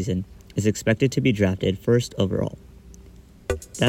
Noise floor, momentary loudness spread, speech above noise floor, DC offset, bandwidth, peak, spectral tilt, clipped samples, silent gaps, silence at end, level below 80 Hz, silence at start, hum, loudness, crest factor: -47 dBFS; 10 LU; 25 dB; under 0.1%; 16.5 kHz; -6 dBFS; -6 dB/octave; under 0.1%; none; 0 s; -46 dBFS; 0 s; none; -24 LUFS; 18 dB